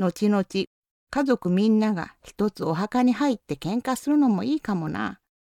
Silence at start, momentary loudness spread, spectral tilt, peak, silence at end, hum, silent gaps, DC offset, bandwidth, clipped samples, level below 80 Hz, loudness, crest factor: 0 s; 10 LU; -6.5 dB/octave; -8 dBFS; 0.25 s; none; 0.67-0.82 s, 0.91-1.07 s; under 0.1%; 15.5 kHz; under 0.1%; -58 dBFS; -24 LUFS; 16 dB